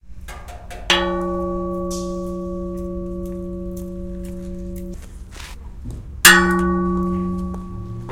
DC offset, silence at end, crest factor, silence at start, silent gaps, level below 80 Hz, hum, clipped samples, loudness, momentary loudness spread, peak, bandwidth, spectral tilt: under 0.1%; 0 s; 22 dB; 0.05 s; none; -34 dBFS; none; under 0.1%; -19 LUFS; 23 LU; 0 dBFS; 17 kHz; -3 dB/octave